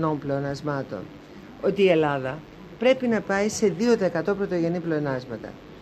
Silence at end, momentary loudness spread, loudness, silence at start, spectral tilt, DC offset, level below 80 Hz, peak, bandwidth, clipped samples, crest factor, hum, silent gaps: 0 s; 17 LU; -24 LUFS; 0 s; -6 dB/octave; under 0.1%; -56 dBFS; -6 dBFS; 13 kHz; under 0.1%; 18 dB; none; none